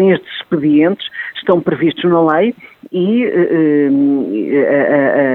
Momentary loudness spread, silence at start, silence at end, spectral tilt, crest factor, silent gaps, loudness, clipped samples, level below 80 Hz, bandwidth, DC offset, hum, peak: 8 LU; 0 s; 0 s; -9.5 dB/octave; 12 dB; none; -13 LUFS; under 0.1%; -60 dBFS; 4.2 kHz; under 0.1%; none; 0 dBFS